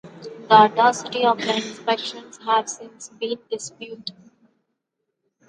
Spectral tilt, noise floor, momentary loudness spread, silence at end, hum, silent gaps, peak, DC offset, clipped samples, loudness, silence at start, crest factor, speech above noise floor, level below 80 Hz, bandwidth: -3 dB/octave; -79 dBFS; 21 LU; 1.35 s; none; none; 0 dBFS; under 0.1%; under 0.1%; -20 LUFS; 0.05 s; 22 dB; 58 dB; -76 dBFS; 10.5 kHz